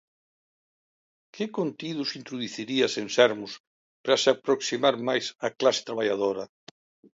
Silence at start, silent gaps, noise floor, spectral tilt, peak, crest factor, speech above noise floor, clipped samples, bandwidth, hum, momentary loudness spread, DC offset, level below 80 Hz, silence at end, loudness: 1.35 s; 3.60-4.04 s; under -90 dBFS; -3.5 dB/octave; -4 dBFS; 22 dB; over 64 dB; under 0.1%; 7.8 kHz; none; 13 LU; under 0.1%; -76 dBFS; 0.75 s; -26 LUFS